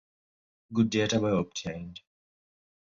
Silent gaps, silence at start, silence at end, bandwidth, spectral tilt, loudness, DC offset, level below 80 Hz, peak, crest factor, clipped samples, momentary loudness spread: none; 0.7 s; 0.9 s; 7.6 kHz; -5 dB/octave; -29 LUFS; under 0.1%; -58 dBFS; -12 dBFS; 18 dB; under 0.1%; 14 LU